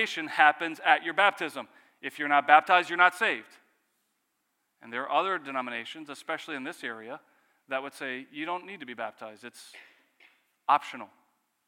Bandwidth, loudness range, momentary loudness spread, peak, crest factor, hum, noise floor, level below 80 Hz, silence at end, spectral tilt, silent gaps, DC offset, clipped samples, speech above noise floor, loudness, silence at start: 15.5 kHz; 13 LU; 21 LU; -4 dBFS; 26 dB; none; -78 dBFS; under -90 dBFS; 0.6 s; -2.5 dB/octave; none; under 0.1%; under 0.1%; 50 dB; -27 LUFS; 0 s